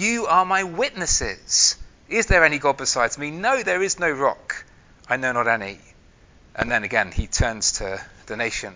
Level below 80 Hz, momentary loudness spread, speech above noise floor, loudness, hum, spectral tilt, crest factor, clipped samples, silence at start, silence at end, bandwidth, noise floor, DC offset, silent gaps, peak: -36 dBFS; 15 LU; 30 dB; -21 LUFS; none; -2 dB/octave; 22 dB; under 0.1%; 0 s; 0 s; 7.8 kHz; -52 dBFS; under 0.1%; none; 0 dBFS